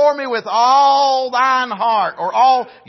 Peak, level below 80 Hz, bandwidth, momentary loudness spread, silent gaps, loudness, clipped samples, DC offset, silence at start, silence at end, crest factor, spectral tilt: -2 dBFS; -78 dBFS; 6.2 kHz; 7 LU; none; -14 LUFS; under 0.1%; under 0.1%; 0 s; 0.2 s; 12 dB; -2.5 dB/octave